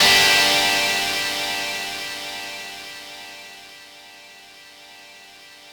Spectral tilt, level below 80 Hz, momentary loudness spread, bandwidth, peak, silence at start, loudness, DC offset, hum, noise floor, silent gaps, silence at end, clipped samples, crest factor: 0 dB/octave; -56 dBFS; 27 LU; over 20 kHz; -4 dBFS; 0 s; -18 LUFS; under 0.1%; none; -45 dBFS; none; 0 s; under 0.1%; 20 dB